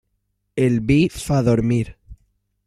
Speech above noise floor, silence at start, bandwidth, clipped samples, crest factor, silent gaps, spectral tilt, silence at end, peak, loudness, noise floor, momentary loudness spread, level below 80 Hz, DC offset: 54 dB; 0.55 s; 14.5 kHz; under 0.1%; 16 dB; none; -7 dB/octave; 0.5 s; -4 dBFS; -19 LUFS; -72 dBFS; 9 LU; -42 dBFS; under 0.1%